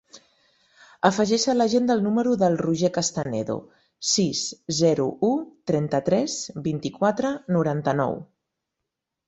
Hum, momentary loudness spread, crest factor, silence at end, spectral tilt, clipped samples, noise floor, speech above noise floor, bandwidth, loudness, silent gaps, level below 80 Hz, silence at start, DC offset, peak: none; 8 LU; 20 dB; 1.05 s; -5 dB/octave; under 0.1%; -83 dBFS; 61 dB; 8.2 kHz; -23 LUFS; none; -62 dBFS; 0.15 s; under 0.1%; -4 dBFS